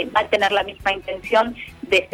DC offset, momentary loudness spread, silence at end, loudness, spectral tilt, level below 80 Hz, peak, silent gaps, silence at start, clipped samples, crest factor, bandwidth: under 0.1%; 8 LU; 0.05 s; -20 LUFS; -3.5 dB/octave; -48 dBFS; -4 dBFS; none; 0 s; under 0.1%; 16 dB; 16 kHz